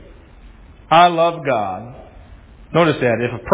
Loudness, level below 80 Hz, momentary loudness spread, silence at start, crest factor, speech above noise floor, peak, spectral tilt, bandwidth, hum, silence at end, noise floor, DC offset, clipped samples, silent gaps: -16 LUFS; -44 dBFS; 14 LU; 0 s; 18 dB; 26 dB; 0 dBFS; -9.5 dB/octave; 4 kHz; none; 0 s; -42 dBFS; under 0.1%; under 0.1%; none